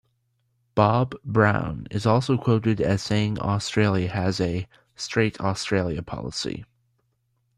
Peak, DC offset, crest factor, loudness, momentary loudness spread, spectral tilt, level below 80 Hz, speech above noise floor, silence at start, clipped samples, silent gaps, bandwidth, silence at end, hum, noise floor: -4 dBFS; under 0.1%; 20 dB; -24 LUFS; 10 LU; -6 dB/octave; -50 dBFS; 48 dB; 0.75 s; under 0.1%; none; 10.5 kHz; 0.95 s; none; -71 dBFS